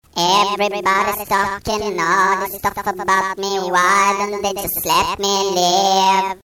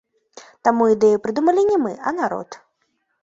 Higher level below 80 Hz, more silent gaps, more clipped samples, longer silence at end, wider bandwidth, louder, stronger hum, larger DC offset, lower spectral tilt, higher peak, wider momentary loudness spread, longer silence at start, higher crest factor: first, -46 dBFS vs -62 dBFS; neither; neither; second, 0.15 s vs 0.65 s; first, over 20 kHz vs 7.8 kHz; about the same, -17 LUFS vs -19 LUFS; neither; first, 0.1% vs under 0.1%; second, -2 dB/octave vs -6 dB/octave; second, -6 dBFS vs -2 dBFS; about the same, 8 LU vs 9 LU; second, 0.15 s vs 0.35 s; second, 12 dB vs 18 dB